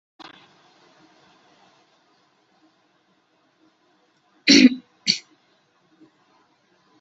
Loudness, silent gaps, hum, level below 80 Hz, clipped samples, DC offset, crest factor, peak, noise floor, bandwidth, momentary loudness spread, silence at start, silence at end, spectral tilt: -17 LUFS; none; none; -70 dBFS; under 0.1%; under 0.1%; 24 dB; -2 dBFS; -64 dBFS; 8 kHz; 14 LU; 4.45 s; 1.8 s; -2 dB/octave